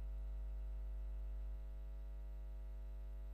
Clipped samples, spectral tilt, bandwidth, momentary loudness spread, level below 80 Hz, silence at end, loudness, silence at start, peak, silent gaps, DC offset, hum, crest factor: under 0.1%; -8 dB/octave; 4 kHz; 3 LU; -46 dBFS; 0 s; -51 LUFS; 0 s; -40 dBFS; none; under 0.1%; 50 Hz at -45 dBFS; 6 dB